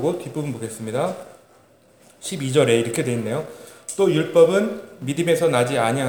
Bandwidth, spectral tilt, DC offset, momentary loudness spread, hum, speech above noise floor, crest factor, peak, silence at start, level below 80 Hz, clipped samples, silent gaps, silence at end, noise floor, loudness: over 20 kHz; -5 dB/octave; 0.1%; 15 LU; none; 33 dB; 18 dB; -2 dBFS; 0 s; -68 dBFS; under 0.1%; none; 0 s; -54 dBFS; -21 LUFS